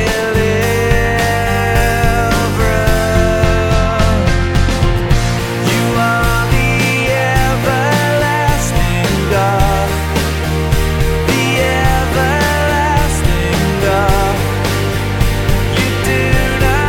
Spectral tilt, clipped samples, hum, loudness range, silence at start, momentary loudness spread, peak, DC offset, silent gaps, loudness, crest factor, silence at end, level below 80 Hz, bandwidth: -5 dB/octave; under 0.1%; none; 1 LU; 0 s; 3 LU; 0 dBFS; under 0.1%; none; -13 LUFS; 12 dB; 0 s; -18 dBFS; 18 kHz